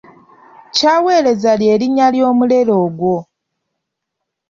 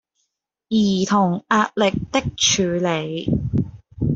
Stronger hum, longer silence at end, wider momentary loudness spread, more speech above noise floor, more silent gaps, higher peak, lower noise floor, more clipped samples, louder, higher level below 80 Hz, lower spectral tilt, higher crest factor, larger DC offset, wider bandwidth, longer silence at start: neither; first, 1.25 s vs 0 s; about the same, 6 LU vs 7 LU; first, 65 dB vs 56 dB; neither; about the same, -2 dBFS vs -4 dBFS; about the same, -77 dBFS vs -75 dBFS; neither; first, -13 LUFS vs -20 LUFS; second, -58 dBFS vs -42 dBFS; about the same, -5 dB/octave vs -4.5 dB/octave; about the same, 14 dB vs 16 dB; neither; about the same, 7.6 kHz vs 7.8 kHz; about the same, 0.75 s vs 0.7 s